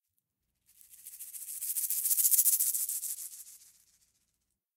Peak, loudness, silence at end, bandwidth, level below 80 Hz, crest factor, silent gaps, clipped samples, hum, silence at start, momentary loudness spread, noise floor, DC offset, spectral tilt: -6 dBFS; -27 LUFS; 1.2 s; 17.5 kHz; -88 dBFS; 28 dB; none; under 0.1%; none; 1.05 s; 21 LU; -82 dBFS; under 0.1%; 5.5 dB/octave